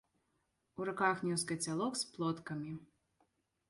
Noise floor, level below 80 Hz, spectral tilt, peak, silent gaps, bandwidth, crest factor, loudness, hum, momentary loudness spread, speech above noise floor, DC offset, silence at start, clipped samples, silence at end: -81 dBFS; -76 dBFS; -4 dB/octave; -18 dBFS; none; 11.5 kHz; 22 dB; -38 LUFS; none; 12 LU; 44 dB; under 0.1%; 0.75 s; under 0.1%; 0.85 s